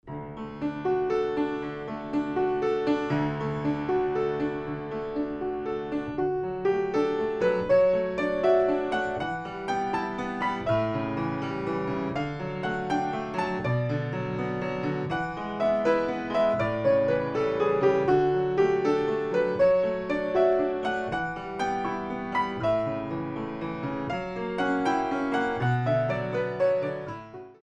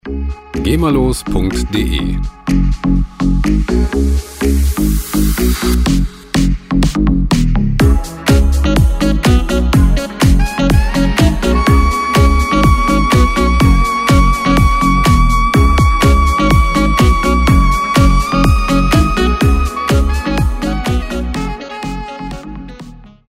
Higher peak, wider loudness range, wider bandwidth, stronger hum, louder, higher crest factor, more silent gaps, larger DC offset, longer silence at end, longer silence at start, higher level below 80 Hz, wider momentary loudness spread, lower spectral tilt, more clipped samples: second, -10 dBFS vs 0 dBFS; about the same, 5 LU vs 4 LU; second, 9 kHz vs 16.5 kHz; neither; second, -27 LUFS vs -13 LUFS; about the same, 16 dB vs 12 dB; neither; neither; about the same, 0.1 s vs 0.2 s; about the same, 0.05 s vs 0.05 s; second, -54 dBFS vs -14 dBFS; about the same, 9 LU vs 8 LU; first, -7.5 dB/octave vs -6 dB/octave; neither